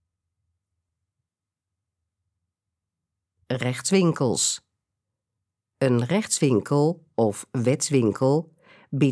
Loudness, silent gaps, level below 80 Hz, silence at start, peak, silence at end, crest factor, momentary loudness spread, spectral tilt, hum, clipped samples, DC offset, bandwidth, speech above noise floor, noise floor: -23 LUFS; none; -70 dBFS; 3.5 s; -6 dBFS; 0 s; 18 dB; 6 LU; -5 dB/octave; none; under 0.1%; under 0.1%; 11 kHz; 66 dB; -88 dBFS